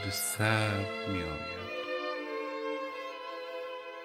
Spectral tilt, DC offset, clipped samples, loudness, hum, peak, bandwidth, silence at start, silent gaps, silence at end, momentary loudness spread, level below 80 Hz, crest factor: -4 dB/octave; under 0.1%; under 0.1%; -34 LUFS; none; -12 dBFS; 16 kHz; 0 s; none; 0 s; 12 LU; -60 dBFS; 24 dB